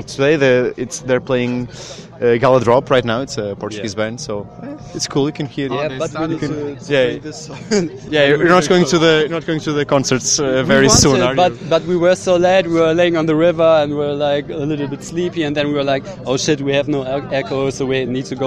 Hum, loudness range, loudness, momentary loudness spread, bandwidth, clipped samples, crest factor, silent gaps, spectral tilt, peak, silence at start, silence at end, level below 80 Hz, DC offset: none; 7 LU; -16 LUFS; 12 LU; 14 kHz; under 0.1%; 16 dB; none; -4.5 dB/octave; 0 dBFS; 0 s; 0 s; -42 dBFS; under 0.1%